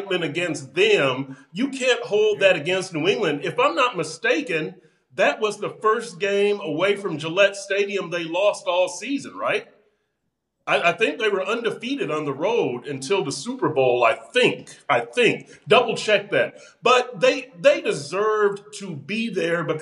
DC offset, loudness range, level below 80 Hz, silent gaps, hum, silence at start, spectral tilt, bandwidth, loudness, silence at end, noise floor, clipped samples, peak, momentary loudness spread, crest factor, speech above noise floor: under 0.1%; 4 LU; -80 dBFS; none; none; 0 s; -4 dB/octave; 11.5 kHz; -22 LUFS; 0 s; -77 dBFS; under 0.1%; -2 dBFS; 9 LU; 20 dB; 55 dB